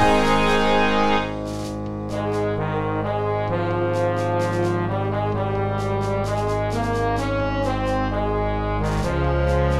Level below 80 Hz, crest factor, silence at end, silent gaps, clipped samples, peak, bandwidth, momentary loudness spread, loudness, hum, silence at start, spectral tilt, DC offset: -32 dBFS; 16 dB; 0 s; none; under 0.1%; -6 dBFS; 13 kHz; 6 LU; -22 LUFS; none; 0 s; -6.5 dB/octave; under 0.1%